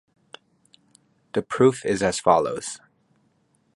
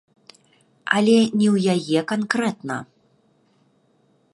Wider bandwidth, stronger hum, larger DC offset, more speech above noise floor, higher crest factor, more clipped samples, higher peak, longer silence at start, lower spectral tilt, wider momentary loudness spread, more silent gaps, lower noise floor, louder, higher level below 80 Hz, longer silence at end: about the same, 11.5 kHz vs 11.5 kHz; neither; neither; about the same, 44 dB vs 43 dB; about the same, 22 dB vs 22 dB; neither; about the same, -2 dBFS vs -2 dBFS; first, 1.35 s vs 0.85 s; about the same, -5 dB/octave vs -5.5 dB/octave; about the same, 13 LU vs 14 LU; neither; first, -66 dBFS vs -62 dBFS; about the same, -22 LUFS vs -20 LUFS; first, -58 dBFS vs -68 dBFS; second, 1 s vs 1.5 s